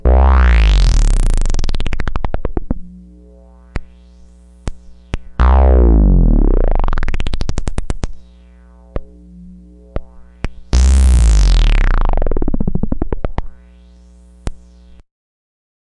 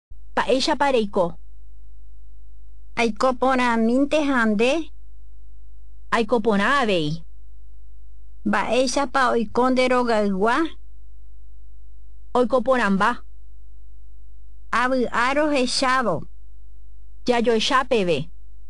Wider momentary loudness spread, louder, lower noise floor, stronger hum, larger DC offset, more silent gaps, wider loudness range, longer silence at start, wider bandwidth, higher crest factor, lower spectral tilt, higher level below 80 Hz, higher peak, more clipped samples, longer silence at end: first, 20 LU vs 8 LU; first, -16 LUFS vs -21 LUFS; about the same, -42 dBFS vs -45 dBFS; about the same, 60 Hz at -40 dBFS vs 50 Hz at -45 dBFS; second, under 0.1% vs 4%; neither; first, 13 LU vs 3 LU; second, 0.05 s vs 0.35 s; about the same, 11 kHz vs 11.5 kHz; about the same, 12 dB vs 16 dB; first, -6.5 dB/octave vs -4.5 dB/octave; first, -14 dBFS vs -44 dBFS; first, 0 dBFS vs -8 dBFS; neither; first, 1.45 s vs 0.45 s